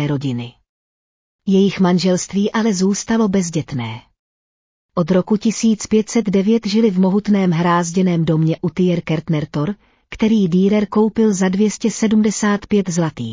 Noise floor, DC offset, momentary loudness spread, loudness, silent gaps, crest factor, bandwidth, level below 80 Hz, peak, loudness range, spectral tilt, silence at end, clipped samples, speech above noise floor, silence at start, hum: under -90 dBFS; under 0.1%; 8 LU; -17 LUFS; 0.69-1.39 s, 4.19-4.89 s; 14 dB; 7.6 kHz; -50 dBFS; -4 dBFS; 3 LU; -6 dB/octave; 0 s; under 0.1%; over 74 dB; 0 s; none